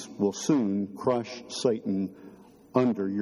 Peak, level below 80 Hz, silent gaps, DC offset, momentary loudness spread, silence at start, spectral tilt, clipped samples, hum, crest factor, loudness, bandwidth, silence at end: -8 dBFS; -70 dBFS; none; under 0.1%; 6 LU; 0 s; -6 dB/octave; under 0.1%; none; 20 dB; -28 LUFS; 13.5 kHz; 0 s